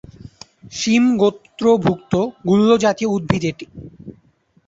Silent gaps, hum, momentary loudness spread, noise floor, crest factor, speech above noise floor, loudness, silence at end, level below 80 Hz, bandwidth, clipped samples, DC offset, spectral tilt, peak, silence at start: none; none; 20 LU; -57 dBFS; 16 dB; 40 dB; -17 LUFS; 0.55 s; -50 dBFS; 7.8 kHz; under 0.1%; under 0.1%; -6 dB/octave; -2 dBFS; 0.25 s